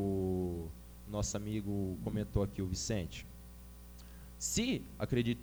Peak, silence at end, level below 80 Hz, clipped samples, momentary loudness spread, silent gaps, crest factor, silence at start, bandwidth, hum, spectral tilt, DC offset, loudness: -18 dBFS; 0 s; -50 dBFS; under 0.1%; 19 LU; none; 18 dB; 0 s; over 20 kHz; 60 Hz at -55 dBFS; -5 dB/octave; under 0.1%; -37 LUFS